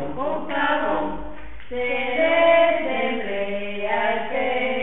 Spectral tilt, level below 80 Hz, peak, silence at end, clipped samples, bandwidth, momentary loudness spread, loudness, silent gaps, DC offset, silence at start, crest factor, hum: -9 dB/octave; -48 dBFS; -6 dBFS; 0 s; under 0.1%; 4 kHz; 13 LU; -22 LUFS; none; 3%; 0 s; 16 dB; none